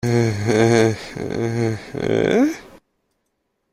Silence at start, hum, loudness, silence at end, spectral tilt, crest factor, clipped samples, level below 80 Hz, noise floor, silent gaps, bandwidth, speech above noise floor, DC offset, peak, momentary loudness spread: 0.05 s; none; -19 LUFS; 0.95 s; -6.5 dB/octave; 18 dB; under 0.1%; -50 dBFS; -72 dBFS; none; 14 kHz; 54 dB; under 0.1%; -2 dBFS; 11 LU